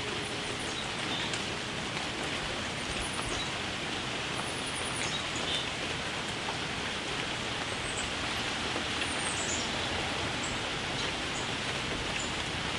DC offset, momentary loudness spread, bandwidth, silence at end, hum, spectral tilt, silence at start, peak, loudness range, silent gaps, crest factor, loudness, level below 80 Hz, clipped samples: under 0.1%; 3 LU; 12 kHz; 0 s; none; -2.5 dB/octave; 0 s; -16 dBFS; 2 LU; none; 18 dB; -32 LUFS; -52 dBFS; under 0.1%